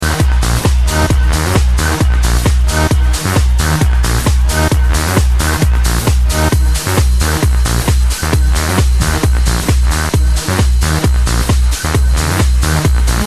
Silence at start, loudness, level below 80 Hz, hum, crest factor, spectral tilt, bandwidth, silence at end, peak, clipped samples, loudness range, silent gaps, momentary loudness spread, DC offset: 0 s; -13 LUFS; -12 dBFS; none; 10 dB; -4.5 dB/octave; 14 kHz; 0 s; 0 dBFS; under 0.1%; 1 LU; none; 1 LU; 1%